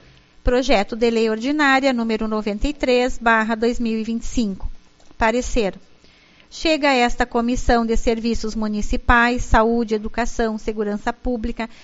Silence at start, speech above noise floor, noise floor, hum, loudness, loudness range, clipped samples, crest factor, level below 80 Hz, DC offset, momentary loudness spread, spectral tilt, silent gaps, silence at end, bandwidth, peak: 0.45 s; 31 dB; -50 dBFS; none; -20 LUFS; 3 LU; under 0.1%; 20 dB; -30 dBFS; under 0.1%; 9 LU; -3.5 dB/octave; none; 0 s; 8 kHz; 0 dBFS